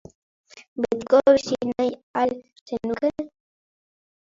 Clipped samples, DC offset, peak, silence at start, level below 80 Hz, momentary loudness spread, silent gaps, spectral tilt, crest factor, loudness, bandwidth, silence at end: under 0.1%; under 0.1%; -4 dBFS; 0.55 s; -60 dBFS; 18 LU; 0.68-0.76 s, 2.03-2.14 s, 2.61-2.66 s; -5 dB/octave; 20 dB; -23 LUFS; 7.6 kHz; 1.1 s